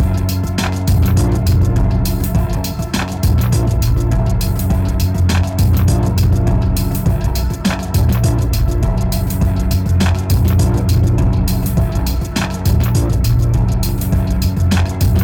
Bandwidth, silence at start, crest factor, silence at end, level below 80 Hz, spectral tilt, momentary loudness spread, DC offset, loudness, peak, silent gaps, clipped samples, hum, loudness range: 19.5 kHz; 0 s; 10 dB; 0 s; -18 dBFS; -6.5 dB/octave; 4 LU; under 0.1%; -16 LUFS; -4 dBFS; none; under 0.1%; none; 1 LU